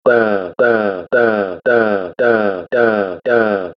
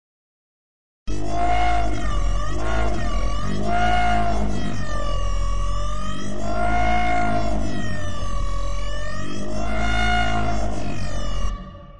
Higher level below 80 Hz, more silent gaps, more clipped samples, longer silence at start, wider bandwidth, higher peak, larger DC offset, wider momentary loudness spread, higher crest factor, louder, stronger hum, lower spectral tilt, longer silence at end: second, -58 dBFS vs -28 dBFS; neither; neither; second, 0.05 s vs 1.05 s; second, 6 kHz vs 10.5 kHz; first, 0 dBFS vs -8 dBFS; second, under 0.1% vs 10%; second, 4 LU vs 9 LU; about the same, 14 dB vs 16 dB; first, -15 LUFS vs -25 LUFS; neither; first, -8 dB/octave vs -5.5 dB/octave; about the same, 0.05 s vs 0 s